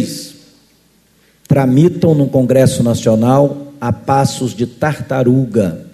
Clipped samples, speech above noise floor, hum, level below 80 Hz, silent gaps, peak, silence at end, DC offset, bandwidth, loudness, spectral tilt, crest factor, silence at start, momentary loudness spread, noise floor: under 0.1%; 40 dB; none; -46 dBFS; none; 0 dBFS; 0.05 s; under 0.1%; 13.5 kHz; -13 LUFS; -7 dB/octave; 14 dB; 0 s; 9 LU; -52 dBFS